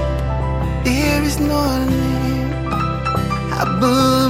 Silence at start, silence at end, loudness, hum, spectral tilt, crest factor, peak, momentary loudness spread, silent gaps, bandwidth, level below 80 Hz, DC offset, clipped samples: 0 s; 0 s; -18 LUFS; none; -6 dB/octave; 14 dB; -2 dBFS; 5 LU; none; 16.5 kHz; -26 dBFS; under 0.1%; under 0.1%